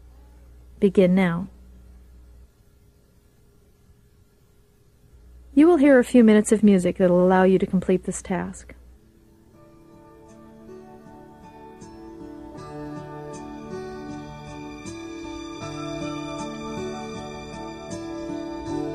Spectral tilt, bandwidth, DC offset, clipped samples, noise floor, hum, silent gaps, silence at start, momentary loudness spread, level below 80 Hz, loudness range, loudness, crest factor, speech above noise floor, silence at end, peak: -6.5 dB/octave; 12.5 kHz; under 0.1%; under 0.1%; -57 dBFS; none; none; 0.8 s; 24 LU; -50 dBFS; 21 LU; -21 LUFS; 20 dB; 39 dB; 0 s; -4 dBFS